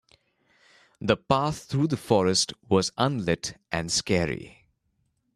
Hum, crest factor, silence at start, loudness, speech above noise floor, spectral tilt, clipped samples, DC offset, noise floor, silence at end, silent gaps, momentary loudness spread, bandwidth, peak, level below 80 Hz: none; 22 dB; 1 s; -26 LUFS; 48 dB; -4.5 dB/octave; under 0.1%; under 0.1%; -73 dBFS; 0.9 s; none; 8 LU; 13 kHz; -6 dBFS; -54 dBFS